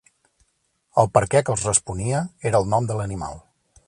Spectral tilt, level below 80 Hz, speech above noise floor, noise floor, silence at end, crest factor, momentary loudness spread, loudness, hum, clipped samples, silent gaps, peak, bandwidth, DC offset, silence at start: -5 dB/octave; -46 dBFS; 48 dB; -69 dBFS; 0.5 s; 22 dB; 10 LU; -22 LUFS; none; under 0.1%; none; -2 dBFS; 11.5 kHz; under 0.1%; 0.95 s